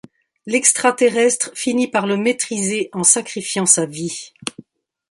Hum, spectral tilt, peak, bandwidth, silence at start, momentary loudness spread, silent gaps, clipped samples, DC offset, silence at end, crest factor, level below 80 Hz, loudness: none; -2.5 dB/octave; 0 dBFS; 11.5 kHz; 0.45 s; 13 LU; none; under 0.1%; under 0.1%; 0.5 s; 18 dB; -66 dBFS; -17 LUFS